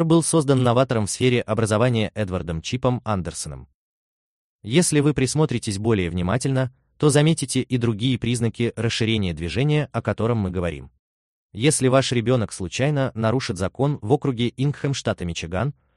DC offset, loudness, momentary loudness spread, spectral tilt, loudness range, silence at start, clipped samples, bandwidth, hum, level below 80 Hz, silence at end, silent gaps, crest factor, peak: under 0.1%; -22 LUFS; 9 LU; -5.5 dB/octave; 3 LU; 0 s; under 0.1%; 12.5 kHz; none; -46 dBFS; 0.25 s; 3.74-4.59 s, 10.99-11.49 s; 18 dB; -4 dBFS